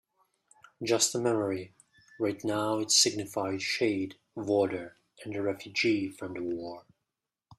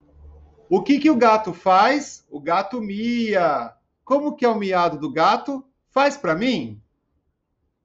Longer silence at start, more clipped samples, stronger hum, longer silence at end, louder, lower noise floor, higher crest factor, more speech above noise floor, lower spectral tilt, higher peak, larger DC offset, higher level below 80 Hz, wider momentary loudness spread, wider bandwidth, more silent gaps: first, 0.8 s vs 0.25 s; neither; neither; second, 0.05 s vs 1.1 s; second, -29 LUFS vs -20 LUFS; first, -87 dBFS vs -73 dBFS; first, 22 dB vs 16 dB; first, 57 dB vs 53 dB; second, -3 dB/octave vs -5.5 dB/octave; second, -10 dBFS vs -6 dBFS; neither; second, -72 dBFS vs -58 dBFS; first, 15 LU vs 11 LU; first, 14.5 kHz vs 8 kHz; neither